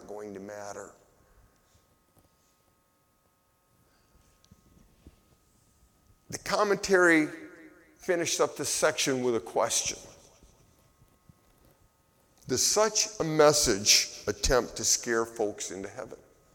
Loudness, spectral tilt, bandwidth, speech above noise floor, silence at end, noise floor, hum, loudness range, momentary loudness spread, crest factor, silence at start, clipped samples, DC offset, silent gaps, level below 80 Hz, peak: -26 LUFS; -2 dB/octave; 19 kHz; 42 dB; 0.4 s; -69 dBFS; none; 11 LU; 20 LU; 22 dB; 0 s; under 0.1%; under 0.1%; none; -50 dBFS; -8 dBFS